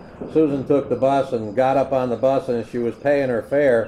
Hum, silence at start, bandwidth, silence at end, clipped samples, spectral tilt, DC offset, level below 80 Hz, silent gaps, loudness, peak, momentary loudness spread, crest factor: none; 0 s; 11 kHz; 0 s; under 0.1%; -7.5 dB/octave; under 0.1%; -52 dBFS; none; -20 LUFS; -6 dBFS; 5 LU; 14 dB